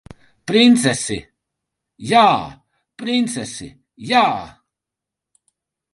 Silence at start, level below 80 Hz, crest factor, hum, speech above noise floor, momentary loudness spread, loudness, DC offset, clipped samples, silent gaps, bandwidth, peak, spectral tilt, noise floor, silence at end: 0.45 s; -54 dBFS; 20 dB; none; 68 dB; 21 LU; -16 LUFS; under 0.1%; under 0.1%; none; 11.5 kHz; 0 dBFS; -4 dB/octave; -85 dBFS; 1.45 s